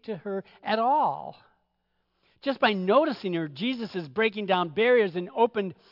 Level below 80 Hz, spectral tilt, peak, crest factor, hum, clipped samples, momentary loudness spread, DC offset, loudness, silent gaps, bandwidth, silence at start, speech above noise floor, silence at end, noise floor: -76 dBFS; -7.5 dB/octave; -10 dBFS; 18 dB; none; under 0.1%; 12 LU; under 0.1%; -26 LUFS; none; 5.8 kHz; 0.05 s; 49 dB; 0.2 s; -75 dBFS